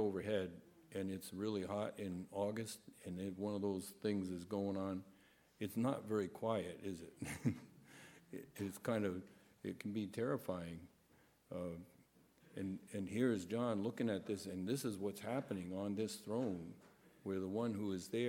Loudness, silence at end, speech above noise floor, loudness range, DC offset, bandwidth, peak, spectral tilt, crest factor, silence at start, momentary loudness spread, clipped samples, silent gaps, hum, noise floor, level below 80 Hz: -43 LUFS; 0 s; 29 dB; 4 LU; under 0.1%; 17 kHz; -24 dBFS; -6 dB/octave; 18 dB; 0 s; 12 LU; under 0.1%; none; none; -72 dBFS; -76 dBFS